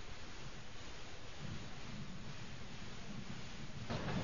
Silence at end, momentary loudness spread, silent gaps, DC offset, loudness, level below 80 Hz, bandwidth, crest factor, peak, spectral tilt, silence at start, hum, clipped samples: 0 s; 7 LU; none; 0.5%; -49 LUFS; -56 dBFS; 7.2 kHz; 18 dB; -28 dBFS; -4.5 dB/octave; 0 s; none; under 0.1%